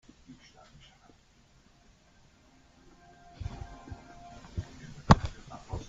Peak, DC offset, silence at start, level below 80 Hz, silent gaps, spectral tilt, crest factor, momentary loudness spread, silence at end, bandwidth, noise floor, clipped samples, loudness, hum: -2 dBFS; under 0.1%; 0.3 s; -46 dBFS; none; -6.5 dB/octave; 32 dB; 30 LU; 0 s; 7.8 kHz; -62 dBFS; under 0.1%; -30 LUFS; none